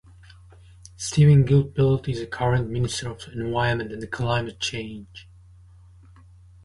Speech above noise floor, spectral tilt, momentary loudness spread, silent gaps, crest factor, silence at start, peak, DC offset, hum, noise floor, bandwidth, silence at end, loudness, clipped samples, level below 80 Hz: 27 dB; -6 dB/octave; 17 LU; none; 18 dB; 1 s; -6 dBFS; under 0.1%; none; -49 dBFS; 11.5 kHz; 1.45 s; -23 LUFS; under 0.1%; -46 dBFS